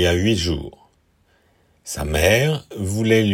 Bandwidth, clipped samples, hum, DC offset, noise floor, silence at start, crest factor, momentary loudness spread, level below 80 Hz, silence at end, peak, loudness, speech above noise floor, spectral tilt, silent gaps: 16.5 kHz; under 0.1%; none; under 0.1%; -60 dBFS; 0 s; 18 dB; 15 LU; -38 dBFS; 0 s; -2 dBFS; -20 LUFS; 42 dB; -5 dB/octave; none